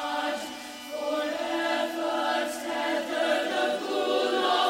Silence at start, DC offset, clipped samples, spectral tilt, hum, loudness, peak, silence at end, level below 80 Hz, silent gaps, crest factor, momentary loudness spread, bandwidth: 0 s; under 0.1%; under 0.1%; -1.5 dB/octave; none; -28 LUFS; -12 dBFS; 0 s; -70 dBFS; none; 16 dB; 8 LU; 16 kHz